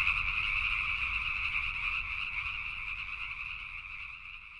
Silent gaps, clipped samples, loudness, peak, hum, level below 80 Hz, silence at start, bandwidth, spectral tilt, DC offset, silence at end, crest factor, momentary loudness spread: none; under 0.1%; -33 LUFS; -16 dBFS; none; -48 dBFS; 0 s; 11 kHz; -2 dB/octave; under 0.1%; 0 s; 18 dB; 11 LU